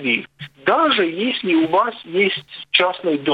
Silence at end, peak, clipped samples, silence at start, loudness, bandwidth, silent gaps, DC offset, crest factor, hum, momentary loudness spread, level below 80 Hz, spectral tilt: 0 s; 0 dBFS; under 0.1%; 0 s; -18 LUFS; 5 kHz; none; under 0.1%; 18 dB; none; 6 LU; -68 dBFS; -6.5 dB/octave